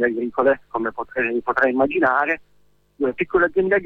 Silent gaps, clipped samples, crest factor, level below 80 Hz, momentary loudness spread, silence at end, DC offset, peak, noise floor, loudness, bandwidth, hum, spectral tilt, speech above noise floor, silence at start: none; under 0.1%; 16 dB; -52 dBFS; 8 LU; 0 s; under 0.1%; -6 dBFS; -57 dBFS; -21 LUFS; 4.9 kHz; 50 Hz at -60 dBFS; -8 dB/octave; 37 dB; 0 s